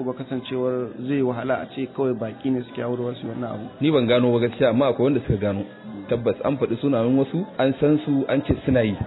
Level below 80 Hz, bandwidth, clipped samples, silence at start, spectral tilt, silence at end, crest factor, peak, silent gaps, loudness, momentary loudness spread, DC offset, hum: -48 dBFS; 4.1 kHz; under 0.1%; 0 s; -11.5 dB/octave; 0 s; 16 dB; -6 dBFS; none; -23 LUFS; 10 LU; under 0.1%; none